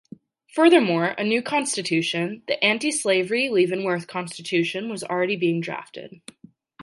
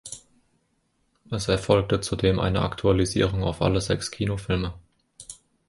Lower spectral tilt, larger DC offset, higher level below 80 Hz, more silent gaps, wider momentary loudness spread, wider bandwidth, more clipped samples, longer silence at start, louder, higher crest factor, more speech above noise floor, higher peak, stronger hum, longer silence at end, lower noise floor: second, -4 dB/octave vs -5.5 dB/octave; neither; second, -74 dBFS vs -40 dBFS; neither; second, 13 LU vs 19 LU; about the same, 11.5 kHz vs 11.5 kHz; neither; first, 0.55 s vs 0.05 s; about the same, -22 LUFS vs -24 LUFS; about the same, 18 dB vs 22 dB; second, 24 dB vs 47 dB; about the same, -4 dBFS vs -4 dBFS; neither; second, 0 s vs 0.35 s; second, -47 dBFS vs -70 dBFS